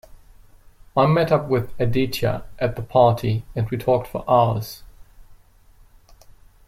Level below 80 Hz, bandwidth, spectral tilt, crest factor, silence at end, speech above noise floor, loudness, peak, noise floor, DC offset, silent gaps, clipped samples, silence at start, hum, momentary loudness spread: -44 dBFS; 16 kHz; -7 dB/octave; 20 dB; 1.35 s; 31 dB; -21 LUFS; -2 dBFS; -51 dBFS; under 0.1%; none; under 0.1%; 0.1 s; none; 9 LU